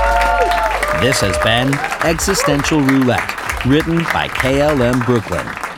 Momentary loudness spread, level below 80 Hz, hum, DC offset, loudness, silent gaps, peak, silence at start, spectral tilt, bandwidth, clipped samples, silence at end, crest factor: 4 LU; -28 dBFS; none; under 0.1%; -15 LUFS; none; -2 dBFS; 0 s; -4.5 dB/octave; 18.5 kHz; under 0.1%; 0 s; 14 dB